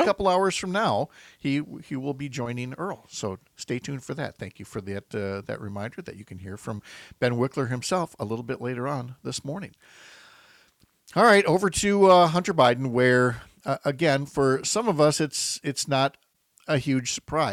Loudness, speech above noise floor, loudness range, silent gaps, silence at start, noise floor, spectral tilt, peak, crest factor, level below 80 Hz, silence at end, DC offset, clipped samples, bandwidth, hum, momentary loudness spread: -25 LUFS; 37 dB; 13 LU; none; 0 s; -62 dBFS; -4.5 dB/octave; -6 dBFS; 18 dB; -56 dBFS; 0 s; under 0.1%; under 0.1%; 15.5 kHz; none; 17 LU